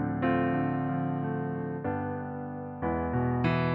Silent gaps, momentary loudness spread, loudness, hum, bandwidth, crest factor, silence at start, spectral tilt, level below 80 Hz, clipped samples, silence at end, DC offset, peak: none; 8 LU; -31 LUFS; none; 5.4 kHz; 14 dB; 0 s; -10.5 dB/octave; -50 dBFS; under 0.1%; 0 s; under 0.1%; -14 dBFS